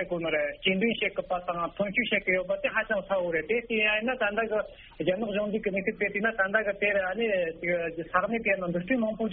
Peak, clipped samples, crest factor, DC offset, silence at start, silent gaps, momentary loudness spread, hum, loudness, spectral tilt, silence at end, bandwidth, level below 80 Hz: -8 dBFS; under 0.1%; 20 dB; under 0.1%; 0 s; none; 5 LU; none; -28 LUFS; -3 dB/octave; 0 s; 3.9 kHz; -56 dBFS